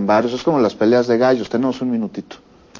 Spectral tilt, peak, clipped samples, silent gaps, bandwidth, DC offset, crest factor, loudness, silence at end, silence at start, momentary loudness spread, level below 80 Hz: -6.5 dB/octave; -4 dBFS; under 0.1%; none; 7.4 kHz; under 0.1%; 14 dB; -17 LUFS; 0 s; 0 s; 9 LU; -56 dBFS